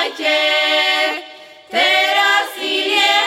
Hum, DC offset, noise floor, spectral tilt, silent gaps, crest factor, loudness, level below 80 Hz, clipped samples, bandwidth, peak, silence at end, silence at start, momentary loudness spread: none; under 0.1%; -38 dBFS; 0.5 dB/octave; none; 14 dB; -14 LUFS; -68 dBFS; under 0.1%; 16.5 kHz; -2 dBFS; 0 s; 0 s; 7 LU